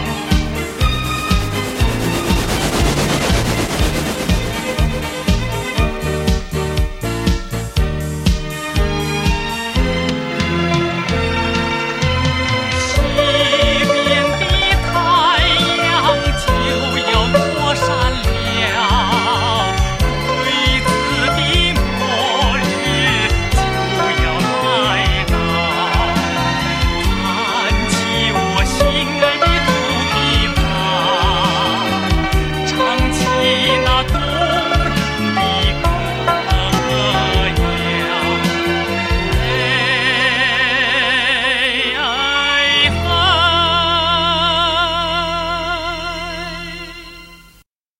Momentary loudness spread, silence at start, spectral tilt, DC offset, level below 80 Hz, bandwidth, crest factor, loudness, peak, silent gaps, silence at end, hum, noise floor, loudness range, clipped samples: 6 LU; 0 s; -4 dB/octave; under 0.1%; -24 dBFS; 16.5 kHz; 16 dB; -15 LUFS; 0 dBFS; none; 0.65 s; none; -51 dBFS; 5 LU; under 0.1%